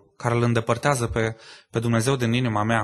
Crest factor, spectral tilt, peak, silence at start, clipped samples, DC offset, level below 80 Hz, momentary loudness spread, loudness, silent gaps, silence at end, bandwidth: 18 dB; -5.5 dB/octave; -4 dBFS; 0.2 s; under 0.1%; under 0.1%; -46 dBFS; 7 LU; -23 LUFS; none; 0 s; 12.5 kHz